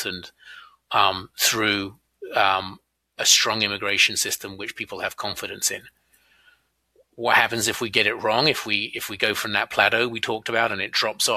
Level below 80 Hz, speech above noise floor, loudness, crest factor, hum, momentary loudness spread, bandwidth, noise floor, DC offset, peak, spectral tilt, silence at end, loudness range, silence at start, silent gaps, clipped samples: -62 dBFS; 40 dB; -21 LUFS; 22 dB; none; 12 LU; 15.5 kHz; -63 dBFS; under 0.1%; -2 dBFS; -1 dB/octave; 0 s; 4 LU; 0 s; none; under 0.1%